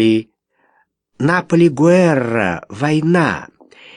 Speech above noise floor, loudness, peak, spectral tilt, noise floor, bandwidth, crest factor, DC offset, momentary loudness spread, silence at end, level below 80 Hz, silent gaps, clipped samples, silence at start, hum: 47 dB; -15 LUFS; 0 dBFS; -7 dB/octave; -61 dBFS; 10.5 kHz; 16 dB; under 0.1%; 9 LU; 0.5 s; -54 dBFS; none; under 0.1%; 0 s; none